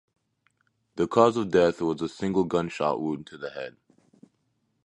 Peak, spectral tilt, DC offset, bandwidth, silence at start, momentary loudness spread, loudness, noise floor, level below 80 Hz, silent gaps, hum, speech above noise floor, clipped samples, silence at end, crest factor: -4 dBFS; -6.5 dB/octave; under 0.1%; 10.5 kHz; 0.95 s; 17 LU; -26 LUFS; -73 dBFS; -60 dBFS; none; none; 48 dB; under 0.1%; 1.15 s; 22 dB